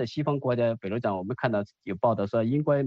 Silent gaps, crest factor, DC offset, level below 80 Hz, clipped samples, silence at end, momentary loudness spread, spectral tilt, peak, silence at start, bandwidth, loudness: none; 16 dB; under 0.1%; -66 dBFS; under 0.1%; 0 s; 5 LU; -9 dB/octave; -10 dBFS; 0 s; 7.2 kHz; -28 LUFS